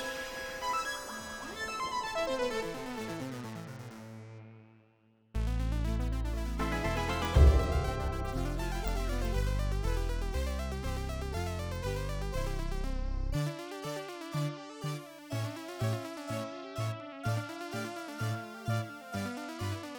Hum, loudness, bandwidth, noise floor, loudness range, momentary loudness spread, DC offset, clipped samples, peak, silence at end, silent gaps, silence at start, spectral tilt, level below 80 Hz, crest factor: none; -35 LUFS; over 20 kHz; -67 dBFS; 7 LU; 8 LU; under 0.1%; under 0.1%; -12 dBFS; 0 s; none; 0 s; -5.5 dB/octave; -36 dBFS; 22 dB